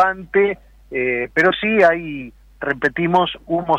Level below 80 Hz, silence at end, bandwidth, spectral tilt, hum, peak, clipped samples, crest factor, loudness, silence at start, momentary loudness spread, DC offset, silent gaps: -48 dBFS; 0 s; 8.6 kHz; -6.5 dB/octave; none; -4 dBFS; under 0.1%; 14 dB; -18 LUFS; 0 s; 15 LU; under 0.1%; none